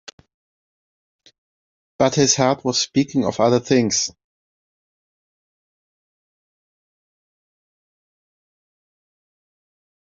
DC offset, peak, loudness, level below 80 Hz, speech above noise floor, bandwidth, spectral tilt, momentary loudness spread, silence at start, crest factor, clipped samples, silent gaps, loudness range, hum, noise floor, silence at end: under 0.1%; -2 dBFS; -18 LUFS; -62 dBFS; over 72 dB; 7.8 kHz; -4 dB/octave; 5 LU; 2 s; 22 dB; under 0.1%; none; 7 LU; none; under -90 dBFS; 5.95 s